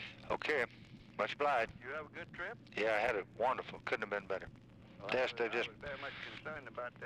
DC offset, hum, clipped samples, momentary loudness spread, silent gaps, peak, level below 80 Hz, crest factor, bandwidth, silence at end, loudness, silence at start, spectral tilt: under 0.1%; none; under 0.1%; 12 LU; none; -22 dBFS; -68 dBFS; 16 dB; 12.5 kHz; 0 s; -39 LUFS; 0 s; -4.5 dB/octave